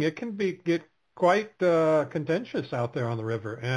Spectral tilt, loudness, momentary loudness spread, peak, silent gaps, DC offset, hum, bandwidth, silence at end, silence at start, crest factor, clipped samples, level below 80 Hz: -7 dB/octave; -27 LUFS; 8 LU; -10 dBFS; none; under 0.1%; none; 11 kHz; 0 s; 0 s; 18 dB; under 0.1%; -70 dBFS